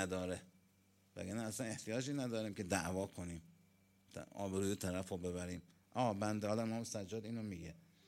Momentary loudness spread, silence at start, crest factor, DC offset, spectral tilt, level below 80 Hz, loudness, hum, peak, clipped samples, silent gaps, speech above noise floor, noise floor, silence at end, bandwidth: 12 LU; 0 s; 22 dB; under 0.1%; -5 dB/octave; -70 dBFS; -43 LUFS; none; -20 dBFS; under 0.1%; none; 31 dB; -73 dBFS; 0.3 s; 16.5 kHz